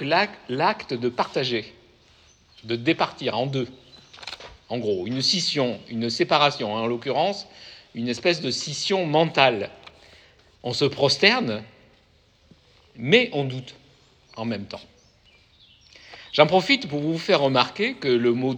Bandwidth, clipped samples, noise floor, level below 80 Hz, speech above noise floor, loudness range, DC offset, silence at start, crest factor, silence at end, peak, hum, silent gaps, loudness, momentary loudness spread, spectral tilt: 10 kHz; under 0.1%; -59 dBFS; -64 dBFS; 36 dB; 5 LU; under 0.1%; 0 s; 24 dB; 0 s; 0 dBFS; none; none; -23 LUFS; 18 LU; -4.5 dB/octave